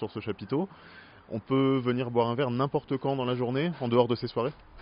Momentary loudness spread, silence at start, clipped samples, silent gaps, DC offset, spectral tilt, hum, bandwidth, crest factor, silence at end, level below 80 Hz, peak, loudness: 9 LU; 0 s; under 0.1%; none; under 0.1%; -6 dB/octave; none; 5.4 kHz; 20 dB; 0 s; -62 dBFS; -10 dBFS; -29 LUFS